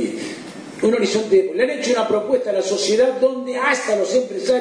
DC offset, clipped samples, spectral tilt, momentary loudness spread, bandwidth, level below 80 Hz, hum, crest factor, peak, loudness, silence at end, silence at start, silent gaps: under 0.1%; under 0.1%; -3.5 dB/octave; 8 LU; 10.5 kHz; -64 dBFS; none; 14 dB; -4 dBFS; -19 LUFS; 0 s; 0 s; none